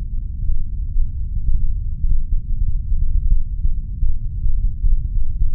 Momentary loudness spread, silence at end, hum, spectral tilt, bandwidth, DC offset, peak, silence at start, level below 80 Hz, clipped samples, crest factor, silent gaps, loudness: 4 LU; 0 s; none; -14.5 dB/octave; 0.4 kHz; under 0.1%; -4 dBFS; 0 s; -18 dBFS; under 0.1%; 12 dB; none; -25 LUFS